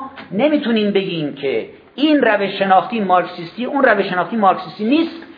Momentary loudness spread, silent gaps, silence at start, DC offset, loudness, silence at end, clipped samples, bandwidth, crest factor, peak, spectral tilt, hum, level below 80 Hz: 9 LU; none; 0 s; under 0.1%; -17 LUFS; 0.05 s; under 0.1%; 5.2 kHz; 16 dB; 0 dBFS; -8.5 dB/octave; none; -64 dBFS